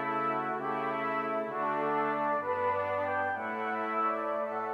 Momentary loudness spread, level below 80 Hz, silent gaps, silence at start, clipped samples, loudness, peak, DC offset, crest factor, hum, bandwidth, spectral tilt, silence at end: 3 LU; -86 dBFS; none; 0 s; under 0.1%; -32 LUFS; -18 dBFS; under 0.1%; 14 dB; none; 13 kHz; -7 dB/octave; 0 s